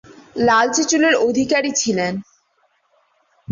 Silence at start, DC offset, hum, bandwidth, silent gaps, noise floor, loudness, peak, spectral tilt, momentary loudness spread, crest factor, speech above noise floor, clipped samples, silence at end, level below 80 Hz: 0.1 s; under 0.1%; none; 7.8 kHz; none; -63 dBFS; -17 LUFS; -4 dBFS; -3 dB/octave; 9 LU; 16 dB; 47 dB; under 0.1%; 0 s; -56 dBFS